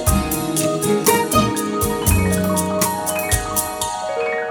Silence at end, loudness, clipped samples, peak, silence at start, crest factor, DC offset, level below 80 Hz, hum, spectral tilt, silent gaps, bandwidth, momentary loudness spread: 0 s; -18 LUFS; under 0.1%; 0 dBFS; 0 s; 18 dB; under 0.1%; -32 dBFS; none; -4 dB/octave; none; over 20 kHz; 6 LU